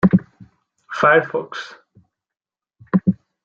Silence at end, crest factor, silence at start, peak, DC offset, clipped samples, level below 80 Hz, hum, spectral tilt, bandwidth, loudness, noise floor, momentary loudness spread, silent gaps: 0.3 s; 18 dB; 0.05 s; -2 dBFS; under 0.1%; under 0.1%; -54 dBFS; none; -8 dB/octave; 7 kHz; -18 LUFS; -57 dBFS; 17 LU; none